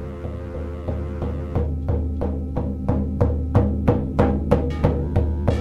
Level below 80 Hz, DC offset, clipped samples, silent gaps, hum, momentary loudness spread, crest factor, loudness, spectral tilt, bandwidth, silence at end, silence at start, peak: -26 dBFS; under 0.1%; under 0.1%; none; none; 9 LU; 16 dB; -23 LUFS; -10 dB/octave; 5.4 kHz; 0 s; 0 s; -6 dBFS